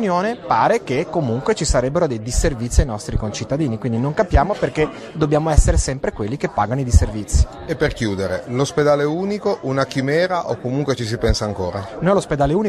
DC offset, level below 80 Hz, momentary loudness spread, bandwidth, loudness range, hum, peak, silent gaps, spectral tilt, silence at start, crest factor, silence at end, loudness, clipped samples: under 0.1%; -24 dBFS; 7 LU; 13 kHz; 1 LU; none; 0 dBFS; none; -5.5 dB/octave; 0 s; 18 dB; 0 s; -20 LUFS; under 0.1%